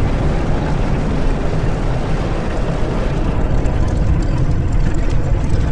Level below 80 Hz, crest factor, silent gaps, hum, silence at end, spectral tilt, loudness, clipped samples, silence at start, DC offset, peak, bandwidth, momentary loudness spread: -18 dBFS; 12 dB; none; none; 0 s; -7.5 dB/octave; -19 LUFS; under 0.1%; 0 s; under 0.1%; -2 dBFS; 9.4 kHz; 3 LU